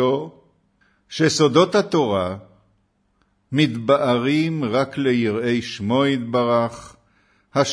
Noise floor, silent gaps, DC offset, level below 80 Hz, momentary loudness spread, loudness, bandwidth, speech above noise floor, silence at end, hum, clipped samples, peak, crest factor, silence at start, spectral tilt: -65 dBFS; none; under 0.1%; -60 dBFS; 10 LU; -20 LUFS; 10.5 kHz; 46 dB; 0 s; none; under 0.1%; -2 dBFS; 20 dB; 0 s; -5.5 dB/octave